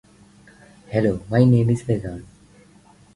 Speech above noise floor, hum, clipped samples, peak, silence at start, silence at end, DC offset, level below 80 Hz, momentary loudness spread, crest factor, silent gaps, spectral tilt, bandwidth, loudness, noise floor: 33 dB; none; under 0.1%; -4 dBFS; 0.9 s; 0.9 s; under 0.1%; -48 dBFS; 14 LU; 18 dB; none; -9 dB/octave; 11 kHz; -20 LUFS; -51 dBFS